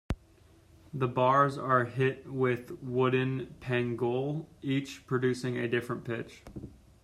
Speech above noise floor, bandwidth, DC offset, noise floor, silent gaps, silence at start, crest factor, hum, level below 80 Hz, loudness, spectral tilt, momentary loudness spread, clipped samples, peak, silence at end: 29 dB; 13 kHz; under 0.1%; -60 dBFS; none; 0.1 s; 20 dB; none; -54 dBFS; -31 LUFS; -7 dB/octave; 14 LU; under 0.1%; -12 dBFS; 0.35 s